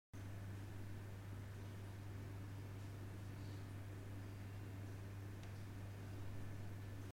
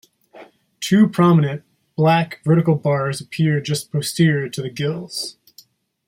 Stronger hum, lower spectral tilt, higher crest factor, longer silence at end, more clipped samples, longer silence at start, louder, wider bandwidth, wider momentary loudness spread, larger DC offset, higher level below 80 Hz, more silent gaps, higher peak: neither; about the same, -6.5 dB/octave vs -6 dB/octave; about the same, 12 dB vs 16 dB; second, 0.05 s vs 0.75 s; neither; second, 0.15 s vs 0.35 s; second, -52 LUFS vs -19 LUFS; about the same, 16.5 kHz vs 16 kHz; second, 1 LU vs 12 LU; neither; about the same, -62 dBFS vs -60 dBFS; neither; second, -38 dBFS vs -4 dBFS